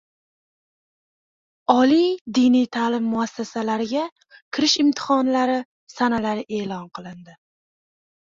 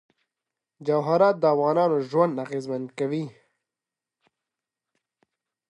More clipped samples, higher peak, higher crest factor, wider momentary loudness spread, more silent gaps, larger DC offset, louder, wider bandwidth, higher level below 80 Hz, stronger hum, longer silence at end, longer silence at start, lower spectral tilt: neither; first, -2 dBFS vs -8 dBFS; about the same, 20 dB vs 20 dB; about the same, 14 LU vs 12 LU; first, 2.21-2.25 s, 4.12-4.16 s, 4.42-4.51 s, 5.65-5.87 s vs none; neither; first, -21 LUFS vs -24 LUFS; second, 7.6 kHz vs 11 kHz; first, -64 dBFS vs -78 dBFS; neither; second, 1.05 s vs 2.4 s; first, 1.7 s vs 0.8 s; second, -4 dB/octave vs -8 dB/octave